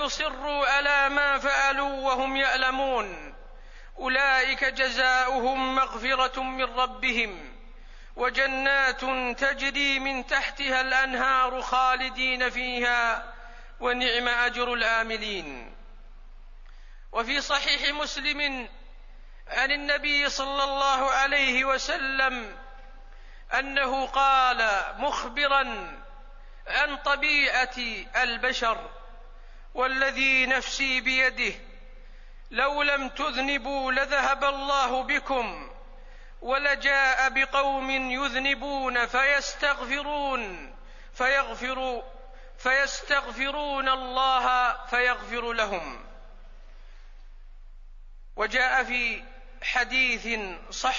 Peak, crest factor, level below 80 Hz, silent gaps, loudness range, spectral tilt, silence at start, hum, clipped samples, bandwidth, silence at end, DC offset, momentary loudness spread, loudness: -8 dBFS; 20 dB; -44 dBFS; none; 4 LU; -1.5 dB/octave; 0 s; none; under 0.1%; 7.4 kHz; 0 s; under 0.1%; 10 LU; -25 LUFS